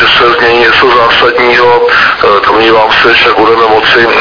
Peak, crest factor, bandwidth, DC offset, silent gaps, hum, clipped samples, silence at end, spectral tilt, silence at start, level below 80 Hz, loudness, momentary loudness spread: 0 dBFS; 6 dB; 5.4 kHz; under 0.1%; none; none; 5%; 0 s; -4.5 dB/octave; 0 s; -34 dBFS; -4 LUFS; 2 LU